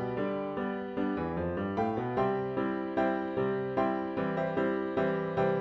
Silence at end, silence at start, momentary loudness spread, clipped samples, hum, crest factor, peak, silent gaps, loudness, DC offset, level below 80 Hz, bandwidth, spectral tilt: 0 s; 0 s; 3 LU; under 0.1%; none; 14 dB; -16 dBFS; none; -32 LUFS; under 0.1%; -58 dBFS; 6.2 kHz; -9 dB/octave